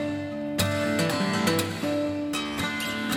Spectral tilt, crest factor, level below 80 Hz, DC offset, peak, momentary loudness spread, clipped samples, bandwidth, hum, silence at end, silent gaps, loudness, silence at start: -4.5 dB/octave; 18 dB; -54 dBFS; under 0.1%; -10 dBFS; 5 LU; under 0.1%; 17 kHz; none; 0 s; none; -27 LUFS; 0 s